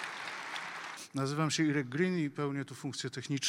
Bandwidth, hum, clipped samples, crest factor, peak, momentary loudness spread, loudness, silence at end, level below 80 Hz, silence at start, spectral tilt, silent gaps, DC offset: 16 kHz; none; under 0.1%; 18 dB; -16 dBFS; 10 LU; -35 LUFS; 0 s; -78 dBFS; 0 s; -4.5 dB/octave; none; under 0.1%